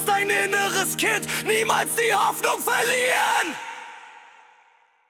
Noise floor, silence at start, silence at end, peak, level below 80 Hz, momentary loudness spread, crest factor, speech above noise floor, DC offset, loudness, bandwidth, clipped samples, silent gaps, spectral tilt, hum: -59 dBFS; 0 s; 0.9 s; -6 dBFS; -66 dBFS; 10 LU; 18 dB; 37 dB; under 0.1%; -21 LUFS; 18 kHz; under 0.1%; none; -1.5 dB/octave; none